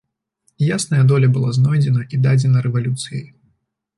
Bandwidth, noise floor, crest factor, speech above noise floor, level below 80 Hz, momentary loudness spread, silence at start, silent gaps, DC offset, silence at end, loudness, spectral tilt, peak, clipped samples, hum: 11.5 kHz; -66 dBFS; 12 dB; 51 dB; -56 dBFS; 9 LU; 0.6 s; none; under 0.1%; 0.7 s; -17 LUFS; -6.5 dB/octave; -6 dBFS; under 0.1%; none